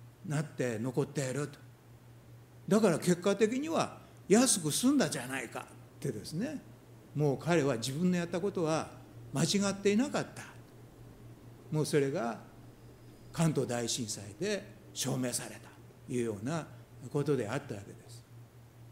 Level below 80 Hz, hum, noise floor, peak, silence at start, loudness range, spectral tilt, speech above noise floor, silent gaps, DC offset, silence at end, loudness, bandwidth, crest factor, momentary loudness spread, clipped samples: -66 dBFS; none; -56 dBFS; -12 dBFS; 0 s; 7 LU; -5 dB/octave; 24 dB; none; under 0.1%; 0 s; -33 LUFS; 16 kHz; 22 dB; 21 LU; under 0.1%